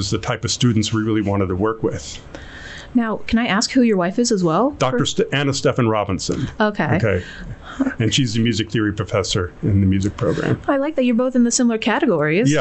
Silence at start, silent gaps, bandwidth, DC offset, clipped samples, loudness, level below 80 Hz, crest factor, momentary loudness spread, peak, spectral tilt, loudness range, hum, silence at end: 0 s; none; 8.4 kHz; under 0.1%; under 0.1%; -19 LUFS; -44 dBFS; 12 dB; 8 LU; -6 dBFS; -5 dB/octave; 2 LU; none; 0 s